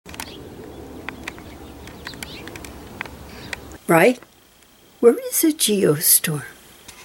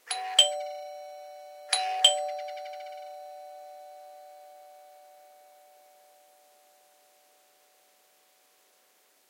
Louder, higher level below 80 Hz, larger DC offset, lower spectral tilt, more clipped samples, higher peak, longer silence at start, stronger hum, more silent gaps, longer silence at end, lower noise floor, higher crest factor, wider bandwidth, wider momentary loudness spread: first, -17 LUFS vs -26 LUFS; first, -50 dBFS vs under -90 dBFS; neither; first, -3.5 dB/octave vs 5.5 dB/octave; neither; about the same, -2 dBFS vs -4 dBFS; about the same, 0.05 s vs 0.05 s; neither; neither; second, 0.55 s vs 4.2 s; second, -52 dBFS vs -65 dBFS; second, 22 dB vs 30 dB; about the same, 18 kHz vs 16.5 kHz; second, 23 LU vs 27 LU